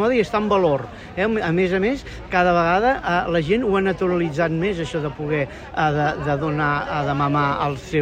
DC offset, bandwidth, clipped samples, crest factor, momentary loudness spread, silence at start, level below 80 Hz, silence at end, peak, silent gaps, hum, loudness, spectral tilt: under 0.1%; 9.6 kHz; under 0.1%; 16 dB; 6 LU; 0 s; -42 dBFS; 0 s; -6 dBFS; none; none; -21 LUFS; -7 dB/octave